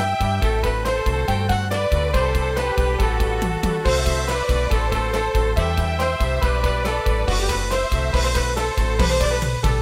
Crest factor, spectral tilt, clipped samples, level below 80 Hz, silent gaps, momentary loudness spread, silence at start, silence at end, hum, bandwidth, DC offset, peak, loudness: 14 dB; -5 dB/octave; under 0.1%; -22 dBFS; none; 2 LU; 0 s; 0 s; none; 16 kHz; under 0.1%; -6 dBFS; -21 LUFS